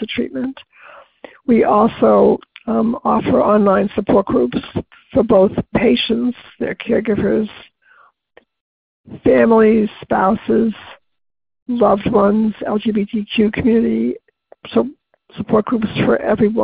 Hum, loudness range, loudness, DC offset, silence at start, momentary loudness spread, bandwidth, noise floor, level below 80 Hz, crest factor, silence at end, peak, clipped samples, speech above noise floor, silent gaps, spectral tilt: none; 4 LU; -16 LUFS; under 0.1%; 0 s; 11 LU; 5 kHz; -53 dBFS; -44 dBFS; 16 dB; 0 s; 0 dBFS; under 0.1%; 38 dB; 8.61-9.04 s, 11.62-11.66 s; -11.5 dB/octave